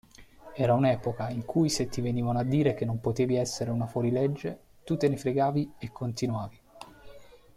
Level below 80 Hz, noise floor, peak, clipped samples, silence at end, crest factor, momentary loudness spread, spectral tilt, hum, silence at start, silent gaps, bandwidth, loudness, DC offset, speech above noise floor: -56 dBFS; -51 dBFS; -12 dBFS; under 0.1%; 0.35 s; 16 dB; 14 LU; -6.5 dB/octave; none; 0.2 s; none; 14.5 kHz; -29 LUFS; under 0.1%; 23 dB